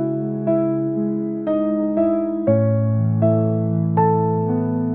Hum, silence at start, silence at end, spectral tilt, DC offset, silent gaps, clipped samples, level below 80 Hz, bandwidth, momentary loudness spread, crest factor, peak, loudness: none; 0 s; 0 s; -11.5 dB/octave; 0.2%; none; under 0.1%; -58 dBFS; 3.4 kHz; 5 LU; 14 dB; -6 dBFS; -19 LUFS